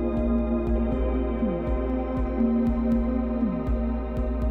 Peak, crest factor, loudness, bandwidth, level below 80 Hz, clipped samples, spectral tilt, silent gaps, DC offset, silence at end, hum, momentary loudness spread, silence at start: -14 dBFS; 12 dB; -26 LUFS; 4.3 kHz; -30 dBFS; under 0.1%; -10.5 dB/octave; none; 0.1%; 0 s; none; 4 LU; 0 s